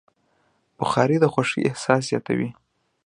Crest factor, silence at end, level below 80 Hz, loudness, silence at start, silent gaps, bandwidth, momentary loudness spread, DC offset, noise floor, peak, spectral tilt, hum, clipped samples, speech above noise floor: 22 dB; 0.55 s; -60 dBFS; -22 LUFS; 0.8 s; none; 11 kHz; 8 LU; under 0.1%; -66 dBFS; -2 dBFS; -6 dB/octave; none; under 0.1%; 45 dB